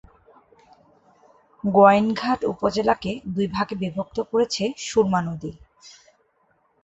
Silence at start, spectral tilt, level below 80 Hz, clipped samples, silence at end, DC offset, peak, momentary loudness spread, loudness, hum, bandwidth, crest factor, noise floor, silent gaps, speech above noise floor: 1.65 s; -5.5 dB/octave; -54 dBFS; under 0.1%; 0.95 s; under 0.1%; -2 dBFS; 13 LU; -22 LUFS; none; 8.2 kHz; 22 dB; -65 dBFS; none; 44 dB